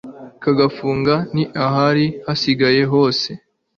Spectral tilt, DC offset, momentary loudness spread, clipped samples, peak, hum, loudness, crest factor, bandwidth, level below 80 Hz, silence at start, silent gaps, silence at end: -6.5 dB/octave; under 0.1%; 9 LU; under 0.1%; -2 dBFS; none; -17 LUFS; 16 dB; 7 kHz; -52 dBFS; 0.05 s; none; 0.4 s